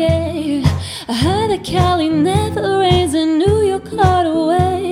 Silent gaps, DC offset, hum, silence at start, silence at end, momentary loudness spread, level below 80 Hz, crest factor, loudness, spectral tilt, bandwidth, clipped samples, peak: none; under 0.1%; none; 0 s; 0 s; 5 LU; -32 dBFS; 14 dB; -15 LUFS; -6 dB/octave; 15.5 kHz; under 0.1%; 0 dBFS